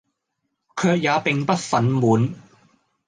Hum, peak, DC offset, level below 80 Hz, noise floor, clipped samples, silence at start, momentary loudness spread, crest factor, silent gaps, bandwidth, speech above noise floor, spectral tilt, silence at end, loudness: none; -6 dBFS; under 0.1%; -62 dBFS; -77 dBFS; under 0.1%; 0.75 s; 6 LU; 18 dB; none; 9.8 kHz; 57 dB; -6 dB/octave; 0.7 s; -20 LUFS